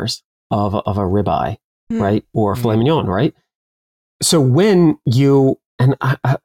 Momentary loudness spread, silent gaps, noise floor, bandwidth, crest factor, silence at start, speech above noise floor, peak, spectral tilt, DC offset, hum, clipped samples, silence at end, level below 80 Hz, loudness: 10 LU; 0.25-0.50 s, 1.64-1.87 s, 3.55-4.20 s, 5.66-5.78 s; under -90 dBFS; 16.5 kHz; 12 dB; 0 s; over 75 dB; -4 dBFS; -6 dB/octave; 0.2%; none; under 0.1%; 0.05 s; -48 dBFS; -16 LUFS